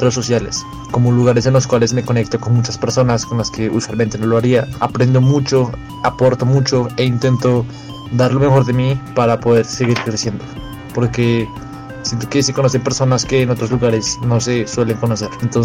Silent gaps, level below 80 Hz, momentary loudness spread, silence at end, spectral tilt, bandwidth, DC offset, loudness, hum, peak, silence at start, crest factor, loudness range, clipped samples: none; -40 dBFS; 9 LU; 0 s; -6 dB/octave; 11.5 kHz; under 0.1%; -15 LUFS; none; -2 dBFS; 0 s; 12 dB; 3 LU; under 0.1%